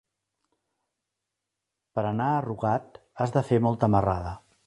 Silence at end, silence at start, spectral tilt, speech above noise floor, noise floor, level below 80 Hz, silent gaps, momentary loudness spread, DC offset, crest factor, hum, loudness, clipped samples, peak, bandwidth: 0.3 s; 1.95 s; -8.5 dB/octave; 60 dB; -85 dBFS; -50 dBFS; none; 9 LU; under 0.1%; 22 dB; none; -26 LUFS; under 0.1%; -6 dBFS; 11 kHz